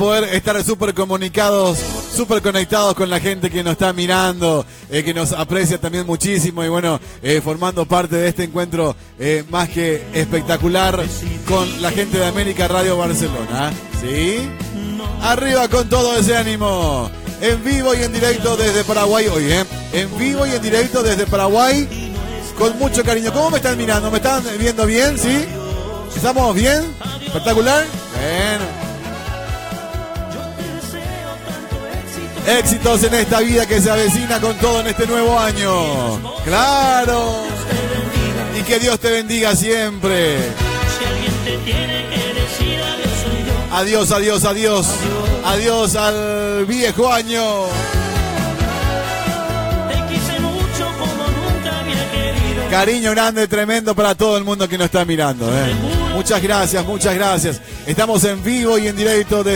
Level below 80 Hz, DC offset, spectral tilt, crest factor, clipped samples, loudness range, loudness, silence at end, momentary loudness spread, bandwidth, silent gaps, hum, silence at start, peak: -30 dBFS; under 0.1%; -4 dB/octave; 14 dB; under 0.1%; 3 LU; -17 LUFS; 0 s; 9 LU; 17.5 kHz; none; none; 0 s; -2 dBFS